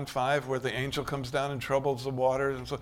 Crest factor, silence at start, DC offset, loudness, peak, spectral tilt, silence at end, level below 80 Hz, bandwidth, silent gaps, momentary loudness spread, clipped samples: 16 dB; 0 s; under 0.1%; -30 LUFS; -14 dBFS; -5.5 dB/octave; 0 s; -54 dBFS; 16.5 kHz; none; 4 LU; under 0.1%